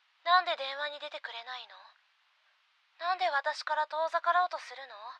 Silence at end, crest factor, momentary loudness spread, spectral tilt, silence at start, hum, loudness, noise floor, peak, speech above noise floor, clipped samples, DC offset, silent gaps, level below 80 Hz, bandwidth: 0 s; 24 dB; 16 LU; 3 dB/octave; 0.25 s; none; -31 LUFS; -70 dBFS; -10 dBFS; 37 dB; under 0.1%; under 0.1%; none; under -90 dBFS; 9.4 kHz